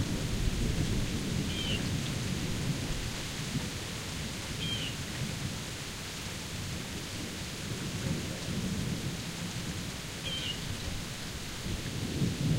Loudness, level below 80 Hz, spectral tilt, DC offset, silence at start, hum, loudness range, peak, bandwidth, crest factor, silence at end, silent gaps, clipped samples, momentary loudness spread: -35 LUFS; -44 dBFS; -4 dB/octave; under 0.1%; 0 s; none; 3 LU; -18 dBFS; 16 kHz; 18 dB; 0 s; none; under 0.1%; 5 LU